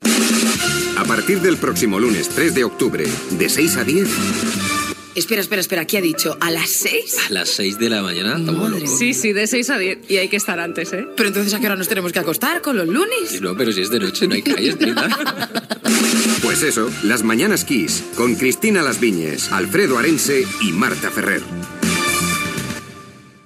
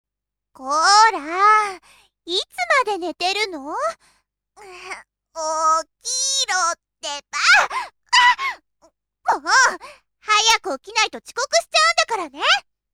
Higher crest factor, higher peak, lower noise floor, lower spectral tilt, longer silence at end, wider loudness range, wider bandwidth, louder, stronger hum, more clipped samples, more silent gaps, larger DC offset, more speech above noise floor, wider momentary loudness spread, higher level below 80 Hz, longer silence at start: about the same, 16 dB vs 18 dB; about the same, -2 dBFS vs -4 dBFS; second, -41 dBFS vs -85 dBFS; first, -3 dB/octave vs 1.5 dB/octave; about the same, 0.25 s vs 0.35 s; second, 2 LU vs 6 LU; about the same, 16 kHz vs 16.5 kHz; about the same, -17 LUFS vs -18 LUFS; neither; neither; neither; neither; second, 23 dB vs 65 dB; second, 5 LU vs 16 LU; first, -54 dBFS vs -62 dBFS; second, 0 s vs 0.6 s